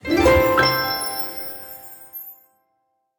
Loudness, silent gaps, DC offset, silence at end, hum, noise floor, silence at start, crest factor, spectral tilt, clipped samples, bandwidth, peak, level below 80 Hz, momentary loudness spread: -19 LUFS; none; under 0.1%; 0.85 s; none; -71 dBFS; 0.05 s; 18 dB; -4.5 dB/octave; under 0.1%; 19.5 kHz; -4 dBFS; -38 dBFS; 20 LU